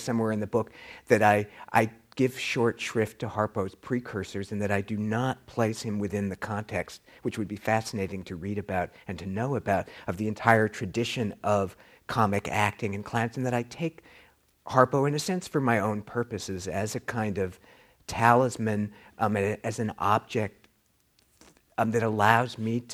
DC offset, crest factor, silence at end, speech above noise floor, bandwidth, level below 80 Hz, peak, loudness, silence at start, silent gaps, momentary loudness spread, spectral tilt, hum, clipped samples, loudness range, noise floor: under 0.1%; 24 dB; 0 s; 41 dB; 15.5 kHz; -60 dBFS; -4 dBFS; -28 LUFS; 0 s; none; 12 LU; -6 dB/octave; none; under 0.1%; 4 LU; -68 dBFS